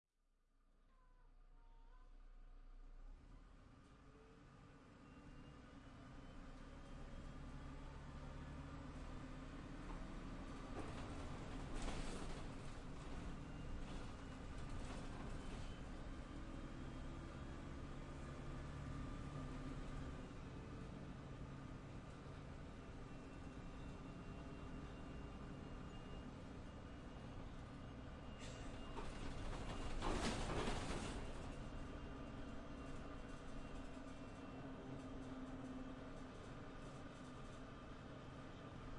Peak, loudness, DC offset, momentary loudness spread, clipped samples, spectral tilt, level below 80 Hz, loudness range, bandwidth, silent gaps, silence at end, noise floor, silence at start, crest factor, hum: -28 dBFS; -53 LUFS; under 0.1%; 11 LU; under 0.1%; -5.5 dB/octave; -56 dBFS; 14 LU; 11 kHz; none; 0 s; -81 dBFS; 0.55 s; 22 dB; none